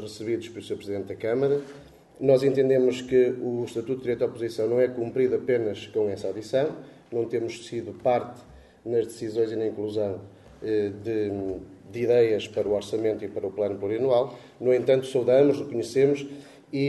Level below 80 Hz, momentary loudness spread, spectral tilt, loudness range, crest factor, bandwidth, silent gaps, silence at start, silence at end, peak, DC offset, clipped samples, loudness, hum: -62 dBFS; 12 LU; -6.5 dB/octave; 5 LU; 18 dB; 12 kHz; none; 0 s; 0 s; -8 dBFS; under 0.1%; under 0.1%; -26 LUFS; none